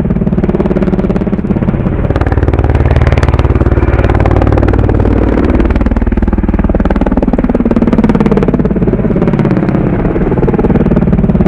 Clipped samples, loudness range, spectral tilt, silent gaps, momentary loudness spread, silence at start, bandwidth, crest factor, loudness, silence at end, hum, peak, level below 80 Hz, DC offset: 0.5%; 1 LU; -10 dB/octave; none; 3 LU; 0 s; 6.6 kHz; 8 dB; -10 LUFS; 0 s; none; 0 dBFS; -14 dBFS; 0.4%